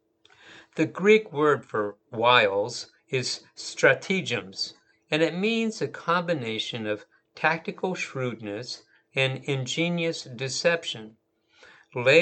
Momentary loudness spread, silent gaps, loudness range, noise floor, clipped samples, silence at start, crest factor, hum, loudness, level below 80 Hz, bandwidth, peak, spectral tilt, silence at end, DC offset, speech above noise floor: 14 LU; none; 5 LU; -57 dBFS; under 0.1%; 0.45 s; 22 dB; none; -26 LUFS; -78 dBFS; 9 kHz; -4 dBFS; -4.5 dB/octave; 0 s; under 0.1%; 32 dB